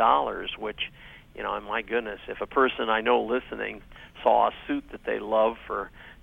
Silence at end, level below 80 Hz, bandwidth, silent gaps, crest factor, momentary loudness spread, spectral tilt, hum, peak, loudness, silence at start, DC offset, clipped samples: 0.1 s; -52 dBFS; 4.5 kHz; none; 20 dB; 12 LU; -6 dB/octave; none; -6 dBFS; -27 LUFS; 0 s; under 0.1%; under 0.1%